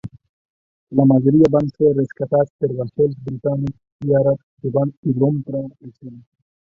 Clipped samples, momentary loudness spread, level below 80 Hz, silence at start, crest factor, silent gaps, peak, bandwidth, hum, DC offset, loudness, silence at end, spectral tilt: under 0.1%; 14 LU; -52 dBFS; 0.05 s; 18 dB; 0.29-0.87 s, 2.50-2.59 s, 3.92-3.99 s, 4.43-4.57 s, 4.97-5.03 s; -2 dBFS; 6.6 kHz; none; under 0.1%; -19 LUFS; 0.55 s; -11 dB/octave